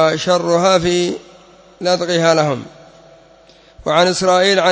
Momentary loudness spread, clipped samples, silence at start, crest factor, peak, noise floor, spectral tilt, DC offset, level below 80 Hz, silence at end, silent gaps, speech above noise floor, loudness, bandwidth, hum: 10 LU; under 0.1%; 0 s; 14 dB; -2 dBFS; -46 dBFS; -4 dB/octave; under 0.1%; -50 dBFS; 0 s; none; 32 dB; -15 LUFS; 8 kHz; none